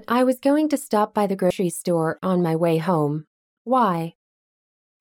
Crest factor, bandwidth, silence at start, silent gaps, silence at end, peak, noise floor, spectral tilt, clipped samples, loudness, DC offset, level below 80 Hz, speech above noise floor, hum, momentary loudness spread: 14 dB; 17.5 kHz; 0.1 s; 3.27-3.65 s; 0.9 s; -8 dBFS; under -90 dBFS; -6.5 dB/octave; under 0.1%; -22 LUFS; under 0.1%; -66 dBFS; over 69 dB; none; 6 LU